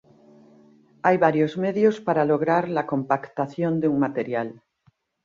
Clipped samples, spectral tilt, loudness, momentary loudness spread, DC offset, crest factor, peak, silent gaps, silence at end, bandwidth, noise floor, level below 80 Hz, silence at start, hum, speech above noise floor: under 0.1%; -8 dB/octave; -23 LUFS; 8 LU; under 0.1%; 20 dB; -4 dBFS; none; 0.7 s; 7.4 kHz; -64 dBFS; -68 dBFS; 1.05 s; none; 42 dB